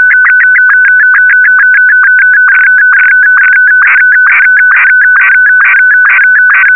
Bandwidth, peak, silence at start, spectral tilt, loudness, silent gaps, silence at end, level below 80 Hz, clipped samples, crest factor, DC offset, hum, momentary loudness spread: 3.2 kHz; 0 dBFS; 0 s; 0 dB/octave; -2 LUFS; none; 0 s; -78 dBFS; under 0.1%; 4 dB; 1%; none; 0 LU